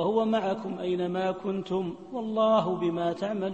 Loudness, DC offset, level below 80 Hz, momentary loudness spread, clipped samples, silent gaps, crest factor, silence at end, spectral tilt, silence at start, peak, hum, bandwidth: -28 LUFS; under 0.1%; -66 dBFS; 8 LU; under 0.1%; none; 14 dB; 0 s; -7.5 dB/octave; 0 s; -14 dBFS; none; 8.4 kHz